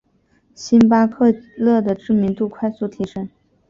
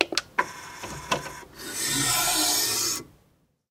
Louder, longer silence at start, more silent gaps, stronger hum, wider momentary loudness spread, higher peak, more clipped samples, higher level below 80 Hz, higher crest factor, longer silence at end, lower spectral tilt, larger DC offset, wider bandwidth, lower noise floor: first, -17 LUFS vs -24 LUFS; first, 0.6 s vs 0 s; neither; neither; second, 14 LU vs 17 LU; about the same, -2 dBFS vs 0 dBFS; neither; about the same, -54 dBFS vs -56 dBFS; second, 16 dB vs 28 dB; second, 0.4 s vs 0.65 s; first, -7.5 dB/octave vs -1 dB/octave; neither; second, 7.4 kHz vs 16 kHz; second, -60 dBFS vs -65 dBFS